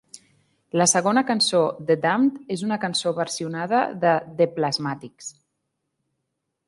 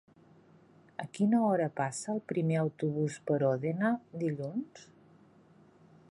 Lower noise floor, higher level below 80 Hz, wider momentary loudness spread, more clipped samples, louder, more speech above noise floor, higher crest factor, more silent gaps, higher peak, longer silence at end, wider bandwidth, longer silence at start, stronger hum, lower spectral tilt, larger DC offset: first, -79 dBFS vs -61 dBFS; first, -70 dBFS vs -78 dBFS; about the same, 10 LU vs 12 LU; neither; first, -22 LUFS vs -32 LUFS; first, 56 dB vs 29 dB; about the same, 18 dB vs 16 dB; neither; first, -6 dBFS vs -16 dBFS; first, 1.4 s vs 1.25 s; about the same, 11.5 kHz vs 11.5 kHz; second, 0.15 s vs 1 s; neither; second, -3.5 dB/octave vs -7 dB/octave; neither